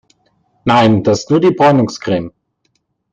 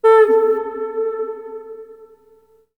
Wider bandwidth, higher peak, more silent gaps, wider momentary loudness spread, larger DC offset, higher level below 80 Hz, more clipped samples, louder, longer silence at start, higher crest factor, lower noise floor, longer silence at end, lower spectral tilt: first, 9 kHz vs 4.3 kHz; about the same, 0 dBFS vs -2 dBFS; neither; second, 10 LU vs 23 LU; neither; first, -50 dBFS vs -64 dBFS; neither; first, -13 LUFS vs -17 LUFS; first, 0.65 s vs 0.05 s; about the same, 14 dB vs 16 dB; first, -65 dBFS vs -53 dBFS; about the same, 0.85 s vs 0.75 s; first, -6.5 dB/octave vs -4 dB/octave